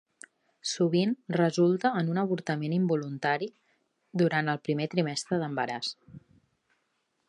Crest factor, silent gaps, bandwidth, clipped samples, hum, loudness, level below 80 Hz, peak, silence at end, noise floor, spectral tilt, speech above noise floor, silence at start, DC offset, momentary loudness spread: 18 dB; none; 11 kHz; under 0.1%; none; -29 LUFS; -76 dBFS; -12 dBFS; 1.1 s; -77 dBFS; -5.5 dB/octave; 49 dB; 0.65 s; under 0.1%; 10 LU